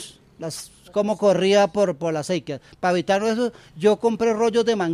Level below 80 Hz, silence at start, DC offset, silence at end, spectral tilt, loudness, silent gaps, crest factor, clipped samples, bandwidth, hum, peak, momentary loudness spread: -60 dBFS; 0 s; under 0.1%; 0 s; -5 dB/octave; -21 LUFS; none; 16 dB; under 0.1%; 14.5 kHz; none; -6 dBFS; 15 LU